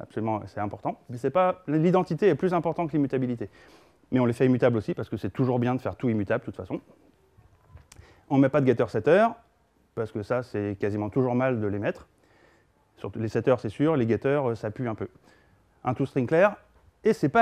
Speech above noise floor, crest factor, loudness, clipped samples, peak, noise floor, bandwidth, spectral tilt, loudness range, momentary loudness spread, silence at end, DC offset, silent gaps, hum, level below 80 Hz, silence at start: 40 dB; 20 dB; -26 LUFS; under 0.1%; -6 dBFS; -65 dBFS; 12 kHz; -8.5 dB/octave; 4 LU; 13 LU; 0 s; under 0.1%; none; none; -62 dBFS; 0 s